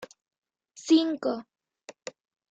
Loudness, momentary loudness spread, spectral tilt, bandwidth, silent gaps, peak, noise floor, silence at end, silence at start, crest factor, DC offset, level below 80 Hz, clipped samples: -26 LUFS; 21 LU; -3.5 dB/octave; 8 kHz; 0.38-0.42 s; -10 dBFS; -53 dBFS; 0.6 s; 0 s; 20 dB; under 0.1%; -78 dBFS; under 0.1%